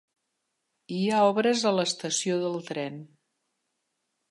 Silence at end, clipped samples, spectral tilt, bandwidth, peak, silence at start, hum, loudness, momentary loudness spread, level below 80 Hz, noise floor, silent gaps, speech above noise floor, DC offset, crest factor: 1.25 s; under 0.1%; -4 dB/octave; 11.5 kHz; -10 dBFS; 0.9 s; none; -26 LUFS; 13 LU; -80 dBFS; -80 dBFS; none; 54 dB; under 0.1%; 18 dB